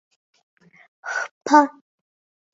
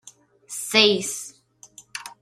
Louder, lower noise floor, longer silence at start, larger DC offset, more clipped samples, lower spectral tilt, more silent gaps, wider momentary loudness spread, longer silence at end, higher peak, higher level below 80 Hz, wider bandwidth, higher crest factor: about the same, -20 LUFS vs -20 LUFS; first, under -90 dBFS vs -50 dBFS; first, 1.05 s vs 0.05 s; neither; neither; about the same, -2.5 dB/octave vs -2 dB/octave; first, 1.31-1.41 s vs none; second, 14 LU vs 20 LU; first, 0.85 s vs 0.1 s; about the same, -2 dBFS vs 0 dBFS; about the same, -72 dBFS vs -72 dBFS; second, 7.8 kHz vs 15.5 kHz; about the same, 22 dB vs 24 dB